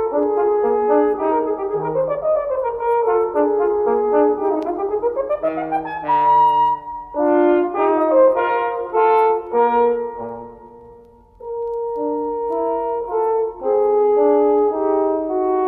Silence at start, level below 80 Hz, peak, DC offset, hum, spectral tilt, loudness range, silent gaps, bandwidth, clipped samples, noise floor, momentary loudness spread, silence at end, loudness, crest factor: 0 s; -52 dBFS; -4 dBFS; under 0.1%; none; -8.5 dB/octave; 6 LU; none; 4.2 kHz; under 0.1%; -45 dBFS; 8 LU; 0 s; -18 LUFS; 14 dB